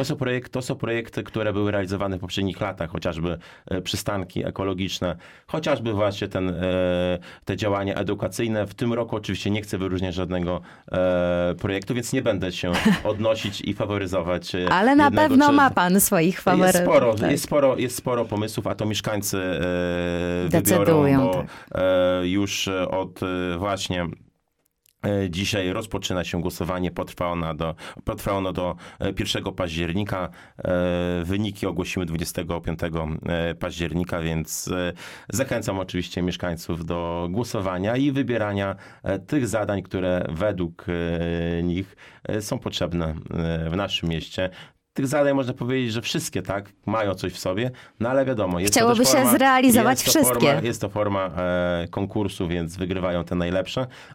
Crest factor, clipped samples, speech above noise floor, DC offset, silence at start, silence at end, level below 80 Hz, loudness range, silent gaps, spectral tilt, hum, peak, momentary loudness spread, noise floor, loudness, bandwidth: 18 dB; under 0.1%; 48 dB; under 0.1%; 0 s; 0 s; -46 dBFS; 9 LU; none; -5 dB/octave; none; -4 dBFS; 12 LU; -72 dBFS; -23 LUFS; 17 kHz